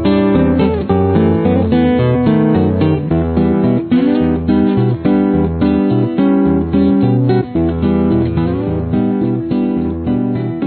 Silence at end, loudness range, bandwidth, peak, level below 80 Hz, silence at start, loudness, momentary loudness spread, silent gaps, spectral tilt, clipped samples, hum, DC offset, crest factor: 0 s; 2 LU; 4.5 kHz; -2 dBFS; -32 dBFS; 0 s; -13 LUFS; 4 LU; none; -12.5 dB/octave; under 0.1%; none; under 0.1%; 10 dB